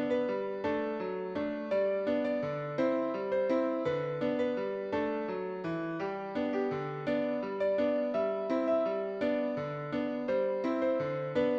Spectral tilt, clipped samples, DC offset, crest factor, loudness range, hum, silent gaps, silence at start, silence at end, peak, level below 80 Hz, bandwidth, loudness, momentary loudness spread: -8 dB/octave; under 0.1%; under 0.1%; 14 dB; 2 LU; none; none; 0 s; 0 s; -18 dBFS; -68 dBFS; 7.2 kHz; -33 LUFS; 5 LU